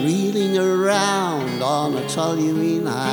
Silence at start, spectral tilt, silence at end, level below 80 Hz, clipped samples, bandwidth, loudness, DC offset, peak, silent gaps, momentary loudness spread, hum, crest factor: 0 s; -5 dB/octave; 0 s; -66 dBFS; under 0.1%; over 20 kHz; -20 LUFS; under 0.1%; -4 dBFS; none; 4 LU; none; 16 dB